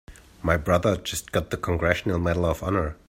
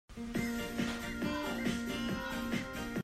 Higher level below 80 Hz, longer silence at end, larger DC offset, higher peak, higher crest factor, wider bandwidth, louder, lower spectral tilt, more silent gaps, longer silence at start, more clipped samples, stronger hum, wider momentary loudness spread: first, -42 dBFS vs -52 dBFS; first, 0.15 s vs 0 s; neither; first, -6 dBFS vs -22 dBFS; about the same, 18 dB vs 16 dB; about the same, 16 kHz vs 15 kHz; first, -25 LUFS vs -37 LUFS; about the same, -5.5 dB/octave vs -4.5 dB/octave; neither; about the same, 0.1 s vs 0.1 s; neither; neither; first, 6 LU vs 2 LU